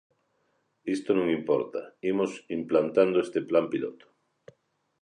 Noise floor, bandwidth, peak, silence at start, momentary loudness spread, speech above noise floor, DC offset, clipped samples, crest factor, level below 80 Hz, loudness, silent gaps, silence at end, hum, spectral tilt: -73 dBFS; 10.5 kHz; -8 dBFS; 0.85 s; 11 LU; 46 dB; under 0.1%; under 0.1%; 20 dB; -70 dBFS; -27 LUFS; none; 1.1 s; none; -6.5 dB/octave